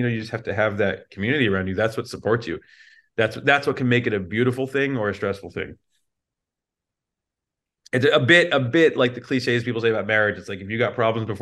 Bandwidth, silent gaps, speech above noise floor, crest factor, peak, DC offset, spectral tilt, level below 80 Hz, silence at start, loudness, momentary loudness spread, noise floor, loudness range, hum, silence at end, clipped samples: 12.5 kHz; none; 64 dB; 20 dB; -2 dBFS; under 0.1%; -6 dB/octave; -60 dBFS; 0 s; -21 LUFS; 10 LU; -86 dBFS; 8 LU; none; 0 s; under 0.1%